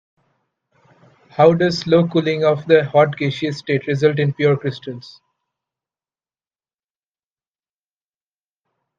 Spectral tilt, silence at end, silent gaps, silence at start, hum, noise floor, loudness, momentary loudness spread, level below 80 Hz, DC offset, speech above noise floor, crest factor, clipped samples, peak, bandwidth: -7 dB/octave; 3.9 s; none; 1.35 s; none; under -90 dBFS; -17 LUFS; 13 LU; -62 dBFS; under 0.1%; over 73 dB; 20 dB; under 0.1%; 0 dBFS; 7.6 kHz